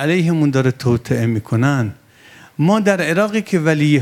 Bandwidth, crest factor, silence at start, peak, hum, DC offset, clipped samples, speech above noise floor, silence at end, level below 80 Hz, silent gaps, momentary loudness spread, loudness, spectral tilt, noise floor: 15.5 kHz; 16 dB; 0 s; 0 dBFS; none; under 0.1%; under 0.1%; 29 dB; 0 s; -52 dBFS; none; 5 LU; -17 LUFS; -7 dB/octave; -44 dBFS